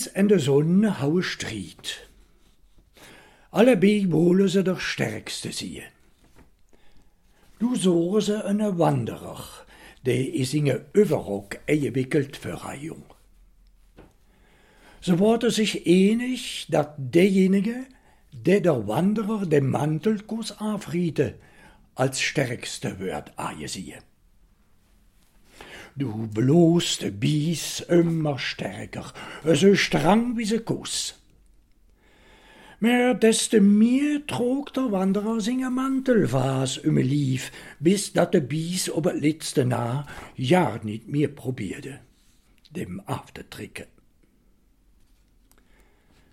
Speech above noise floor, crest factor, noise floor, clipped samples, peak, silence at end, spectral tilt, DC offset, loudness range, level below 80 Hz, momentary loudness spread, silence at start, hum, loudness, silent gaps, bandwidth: 37 dB; 18 dB; -60 dBFS; under 0.1%; -6 dBFS; 2.5 s; -5.5 dB/octave; under 0.1%; 10 LU; -56 dBFS; 16 LU; 0 s; none; -23 LUFS; none; 16 kHz